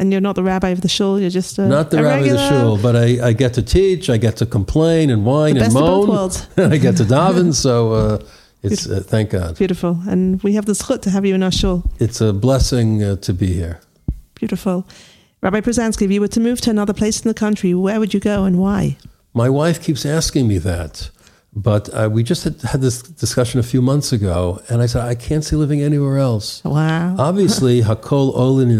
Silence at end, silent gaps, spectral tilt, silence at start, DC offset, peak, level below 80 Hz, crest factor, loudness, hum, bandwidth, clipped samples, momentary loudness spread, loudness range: 0 s; none; -6 dB/octave; 0 s; under 0.1%; -2 dBFS; -32 dBFS; 14 dB; -16 LUFS; none; 15 kHz; under 0.1%; 7 LU; 4 LU